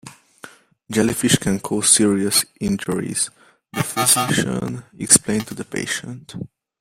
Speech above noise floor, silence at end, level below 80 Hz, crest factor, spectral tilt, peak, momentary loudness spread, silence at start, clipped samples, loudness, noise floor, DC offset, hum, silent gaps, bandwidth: 25 dB; 0.35 s; -52 dBFS; 20 dB; -3 dB/octave; 0 dBFS; 17 LU; 0.05 s; under 0.1%; -18 LUFS; -44 dBFS; under 0.1%; none; none; 16.5 kHz